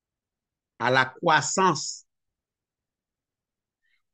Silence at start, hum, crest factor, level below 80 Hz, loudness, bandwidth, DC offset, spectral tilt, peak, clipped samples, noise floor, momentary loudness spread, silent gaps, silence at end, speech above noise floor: 0.8 s; none; 24 dB; -72 dBFS; -23 LUFS; 9.2 kHz; under 0.1%; -3 dB/octave; -4 dBFS; under 0.1%; -89 dBFS; 11 LU; none; 2.15 s; 66 dB